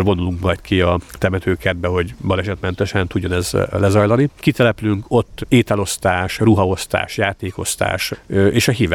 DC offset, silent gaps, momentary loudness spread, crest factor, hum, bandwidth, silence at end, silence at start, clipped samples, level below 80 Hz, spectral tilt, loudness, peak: under 0.1%; none; 6 LU; 16 dB; none; 17.5 kHz; 0 s; 0 s; under 0.1%; -38 dBFS; -5.5 dB/octave; -18 LUFS; -2 dBFS